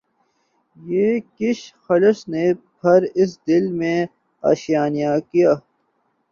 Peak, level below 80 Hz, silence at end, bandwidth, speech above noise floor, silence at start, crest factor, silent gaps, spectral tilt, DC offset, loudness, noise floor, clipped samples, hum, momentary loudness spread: -2 dBFS; -64 dBFS; 0.7 s; 7.2 kHz; 49 dB; 0.85 s; 18 dB; none; -7 dB/octave; under 0.1%; -19 LUFS; -67 dBFS; under 0.1%; none; 7 LU